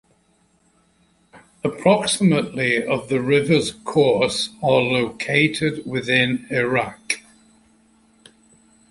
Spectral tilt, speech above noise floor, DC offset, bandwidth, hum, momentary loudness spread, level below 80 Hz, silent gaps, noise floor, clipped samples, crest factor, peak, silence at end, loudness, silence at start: -4.5 dB/octave; 42 dB; under 0.1%; 11.5 kHz; none; 8 LU; -56 dBFS; none; -61 dBFS; under 0.1%; 20 dB; -2 dBFS; 1.7 s; -20 LUFS; 1.35 s